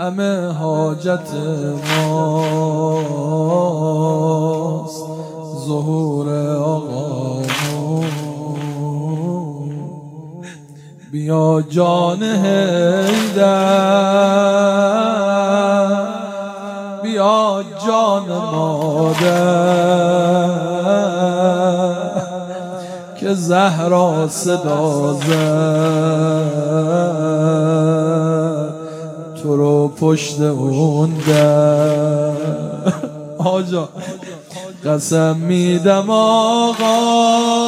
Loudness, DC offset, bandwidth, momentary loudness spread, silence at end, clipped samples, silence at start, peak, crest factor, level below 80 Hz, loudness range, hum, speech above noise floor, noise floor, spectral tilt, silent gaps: -16 LUFS; under 0.1%; 15.5 kHz; 13 LU; 0 s; under 0.1%; 0 s; 0 dBFS; 16 dB; -64 dBFS; 6 LU; none; 24 dB; -38 dBFS; -6 dB/octave; none